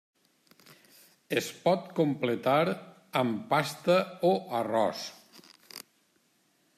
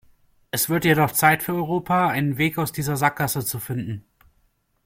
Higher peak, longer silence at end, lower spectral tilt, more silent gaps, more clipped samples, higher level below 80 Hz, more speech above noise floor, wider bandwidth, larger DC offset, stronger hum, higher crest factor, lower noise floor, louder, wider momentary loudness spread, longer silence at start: second, -12 dBFS vs -2 dBFS; first, 1 s vs 0.85 s; about the same, -5.5 dB/octave vs -4.5 dB/octave; neither; neither; second, -76 dBFS vs -54 dBFS; about the same, 42 dB vs 44 dB; about the same, 15.5 kHz vs 16.5 kHz; neither; neither; about the same, 20 dB vs 20 dB; first, -70 dBFS vs -66 dBFS; second, -29 LUFS vs -22 LUFS; first, 15 LU vs 11 LU; first, 1.3 s vs 0.55 s